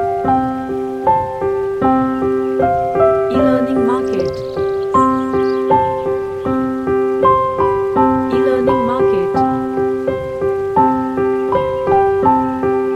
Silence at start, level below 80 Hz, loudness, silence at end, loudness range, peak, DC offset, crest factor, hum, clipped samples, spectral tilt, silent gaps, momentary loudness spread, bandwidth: 0 s; -42 dBFS; -15 LUFS; 0 s; 1 LU; 0 dBFS; under 0.1%; 14 dB; none; under 0.1%; -8 dB/octave; none; 6 LU; 8.8 kHz